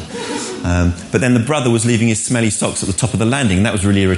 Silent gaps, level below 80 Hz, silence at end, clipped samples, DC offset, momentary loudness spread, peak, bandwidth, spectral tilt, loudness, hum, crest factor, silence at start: none; -30 dBFS; 0 s; under 0.1%; under 0.1%; 5 LU; 0 dBFS; 11.5 kHz; -5 dB/octave; -16 LUFS; none; 14 dB; 0 s